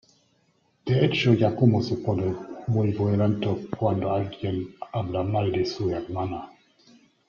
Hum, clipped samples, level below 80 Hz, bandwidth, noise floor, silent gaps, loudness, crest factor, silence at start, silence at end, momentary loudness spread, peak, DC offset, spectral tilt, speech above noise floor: none; under 0.1%; -58 dBFS; 7 kHz; -67 dBFS; none; -25 LUFS; 18 dB; 0.85 s; 0.8 s; 12 LU; -6 dBFS; under 0.1%; -8 dB/octave; 43 dB